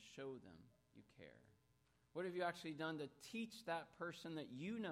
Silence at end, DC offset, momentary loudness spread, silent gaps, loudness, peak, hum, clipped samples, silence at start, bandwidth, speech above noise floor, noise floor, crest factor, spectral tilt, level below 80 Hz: 0 s; under 0.1%; 19 LU; none; -49 LUFS; -32 dBFS; none; under 0.1%; 0 s; 16 kHz; 30 dB; -79 dBFS; 18 dB; -5 dB/octave; -86 dBFS